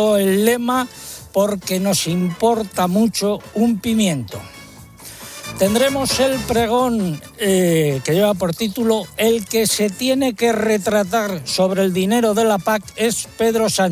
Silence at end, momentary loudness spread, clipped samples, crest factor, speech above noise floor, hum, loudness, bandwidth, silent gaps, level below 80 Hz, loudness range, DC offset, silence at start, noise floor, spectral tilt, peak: 0 s; 7 LU; under 0.1%; 16 dB; 22 dB; none; -18 LUFS; 16 kHz; none; -46 dBFS; 2 LU; under 0.1%; 0 s; -40 dBFS; -4.5 dB/octave; -2 dBFS